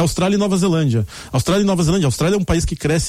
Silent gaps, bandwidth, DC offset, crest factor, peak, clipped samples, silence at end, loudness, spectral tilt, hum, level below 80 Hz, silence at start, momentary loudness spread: none; 16 kHz; under 0.1%; 12 dB; -4 dBFS; under 0.1%; 0 s; -17 LUFS; -5.5 dB/octave; none; -32 dBFS; 0 s; 4 LU